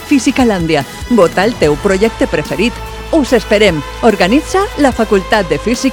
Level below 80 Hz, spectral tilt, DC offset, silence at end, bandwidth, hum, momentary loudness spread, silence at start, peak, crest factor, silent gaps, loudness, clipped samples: -28 dBFS; -5 dB/octave; under 0.1%; 0 s; 18.5 kHz; none; 5 LU; 0 s; 0 dBFS; 12 dB; none; -12 LUFS; 0.2%